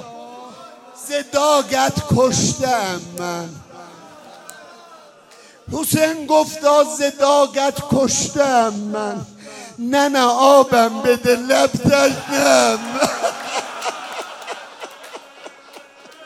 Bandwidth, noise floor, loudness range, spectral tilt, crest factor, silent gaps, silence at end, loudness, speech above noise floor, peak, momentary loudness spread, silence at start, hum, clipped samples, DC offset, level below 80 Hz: 16 kHz; -46 dBFS; 10 LU; -3.5 dB/octave; 18 dB; none; 0 s; -17 LUFS; 30 dB; 0 dBFS; 21 LU; 0 s; none; under 0.1%; under 0.1%; -52 dBFS